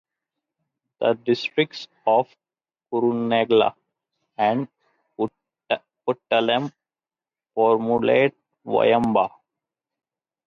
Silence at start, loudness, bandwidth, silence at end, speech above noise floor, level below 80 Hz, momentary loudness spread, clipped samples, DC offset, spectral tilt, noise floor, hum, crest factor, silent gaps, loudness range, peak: 1 s; -22 LUFS; 7 kHz; 1.2 s; over 70 dB; -66 dBFS; 11 LU; under 0.1%; under 0.1%; -6.5 dB/octave; under -90 dBFS; none; 18 dB; none; 4 LU; -6 dBFS